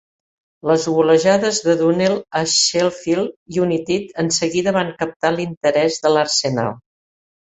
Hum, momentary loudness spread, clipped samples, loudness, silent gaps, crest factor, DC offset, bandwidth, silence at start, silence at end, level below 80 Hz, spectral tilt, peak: none; 7 LU; under 0.1%; -18 LUFS; 3.36-3.46 s, 5.16-5.20 s, 5.57-5.61 s; 16 dB; under 0.1%; 8.4 kHz; 0.65 s; 0.75 s; -58 dBFS; -3.5 dB/octave; -2 dBFS